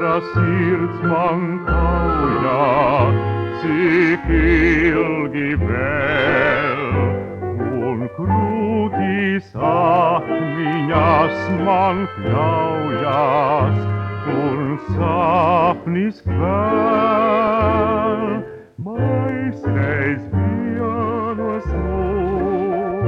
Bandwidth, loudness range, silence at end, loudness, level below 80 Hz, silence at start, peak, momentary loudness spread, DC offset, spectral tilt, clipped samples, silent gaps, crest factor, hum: 6.6 kHz; 4 LU; 0 s; -18 LUFS; -32 dBFS; 0 s; -2 dBFS; 7 LU; under 0.1%; -9 dB/octave; under 0.1%; none; 16 dB; none